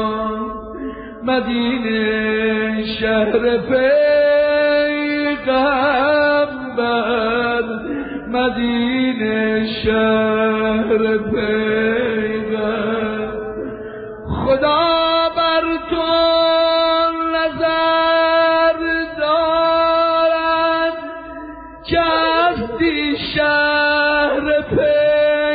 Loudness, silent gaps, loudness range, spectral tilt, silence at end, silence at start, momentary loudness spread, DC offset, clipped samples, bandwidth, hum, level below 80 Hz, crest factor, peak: -16 LUFS; none; 4 LU; -10 dB/octave; 0 s; 0 s; 10 LU; under 0.1%; under 0.1%; 5 kHz; none; -42 dBFS; 12 dB; -4 dBFS